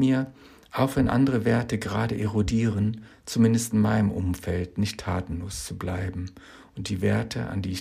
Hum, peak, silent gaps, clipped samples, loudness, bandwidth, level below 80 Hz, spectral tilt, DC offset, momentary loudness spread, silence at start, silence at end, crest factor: none; -10 dBFS; none; under 0.1%; -26 LUFS; 15.5 kHz; -46 dBFS; -6.5 dB/octave; under 0.1%; 11 LU; 0 s; 0 s; 16 dB